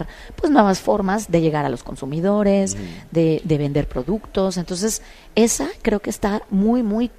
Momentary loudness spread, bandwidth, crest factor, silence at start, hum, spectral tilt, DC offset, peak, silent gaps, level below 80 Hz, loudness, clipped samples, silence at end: 8 LU; 14.5 kHz; 20 dB; 0 s; none; -5.5 dB/octave; under 0.1%; 0 dBFS; none; -40 dBFS; -20 LUFS; under 0.1%; 0.1 s